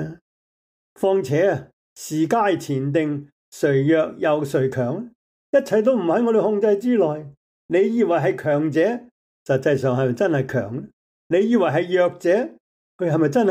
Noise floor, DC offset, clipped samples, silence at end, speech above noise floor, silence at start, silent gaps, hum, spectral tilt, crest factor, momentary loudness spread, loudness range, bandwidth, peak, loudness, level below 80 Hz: under -90 dBFS; under 0.1%; under 0.1%; 0 s; over 71 dB; 0 s; 0.21-0.96 s, 1.73-1.96 s, 3.32-3.52 s, 5.15-5.53 s, 7.37-7.69 s, 9.11-9.46 s, 10.93-11.30 s, 12.60-12.99 s; none; -7 dB/octave; 14 dB; 11 LU; 2 LU; 16 kHz; -6 dBFS; -20 LUFS; -66 dBFS